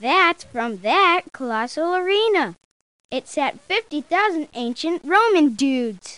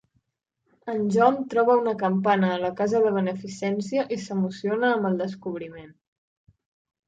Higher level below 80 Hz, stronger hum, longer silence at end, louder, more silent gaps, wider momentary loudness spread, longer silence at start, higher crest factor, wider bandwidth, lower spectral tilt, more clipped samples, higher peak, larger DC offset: about the same, -66 dBFS vs -68 dBFS; neither; second, 0 s vs 1.2 s; first, -20 LUFS vs -24 LUFS; first, 2.65-3.09 s vs none; about the same, 11 LU vs 11 LU; second, 0 s vs 0.85 s; about the same, 18 dB vs 18 dB; first, 11 kHz vs 8.6 kHz; second, -3 dB/octave vs -6.5 dB/octave; neither; about the same, -4 dBFS vs -6 dBFS; first, 0.2% vs under 0.1%